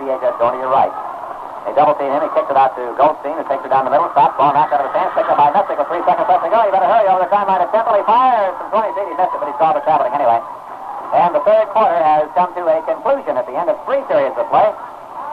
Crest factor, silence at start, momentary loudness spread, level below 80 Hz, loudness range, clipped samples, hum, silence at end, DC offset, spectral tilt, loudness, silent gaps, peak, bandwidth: 12 dB; 0 s; 8 LU; -60 dBFS; 3 LU; under 0.1%; none; 0 s; under 0.1%; -6.5 dB/octave; -15 LUFS; none; -2 dBFS; 5.6 kHz